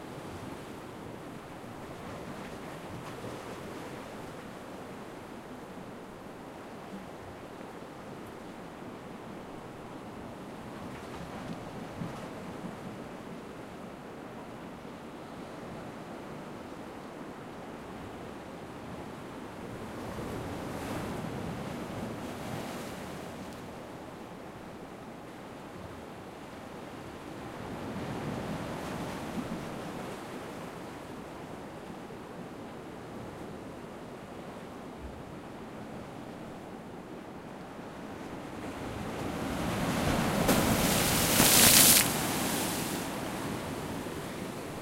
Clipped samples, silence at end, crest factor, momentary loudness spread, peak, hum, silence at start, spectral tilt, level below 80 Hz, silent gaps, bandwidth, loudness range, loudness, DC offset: under 0.1%; 0 s; 32 dB; 15 LU; -4 dBFS; none; 0 s; -3 dB/octave; -54 dBFS; none; 16 kHz; 21 LU; -32 LUFS; under 0.1%